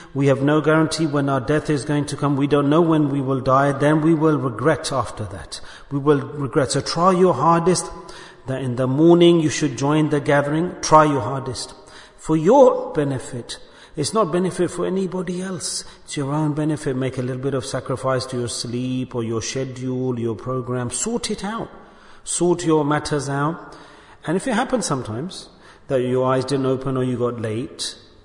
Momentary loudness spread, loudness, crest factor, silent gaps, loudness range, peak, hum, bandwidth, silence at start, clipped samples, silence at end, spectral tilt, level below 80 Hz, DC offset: 14 LU; -20 LUFS; 20 dB; none; 7 LU; 0 dBFS; none; 11 kHz; 0 s; under 0.1%; 0.3 s; -5.5 dB/octave; -50 dBFS; under 0.1%